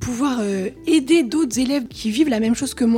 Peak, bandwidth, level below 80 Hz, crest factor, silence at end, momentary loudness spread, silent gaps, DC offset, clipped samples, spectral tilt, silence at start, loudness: -4 dBFS; 16 kHz; -46 dBFS; 14 dB; 0 s; 7 LU; none; under 0.1%; under 0.1%; -4.5 dB/octave; 0 s; -20 LUFS